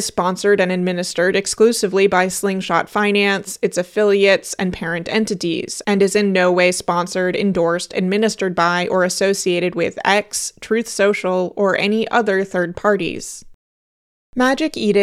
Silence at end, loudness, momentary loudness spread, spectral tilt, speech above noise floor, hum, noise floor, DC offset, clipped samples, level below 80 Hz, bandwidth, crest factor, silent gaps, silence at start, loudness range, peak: 0 s; -17 LUFS; 6 LU; -4 dB/octave; over 73 dB; none; under -90 dBFS; under 0.1%; under 0.1%; -52 dBFS; 15 kHz; 18 dB; 13.54-14.33 s; 0 s; 2 LU; 0 dBFS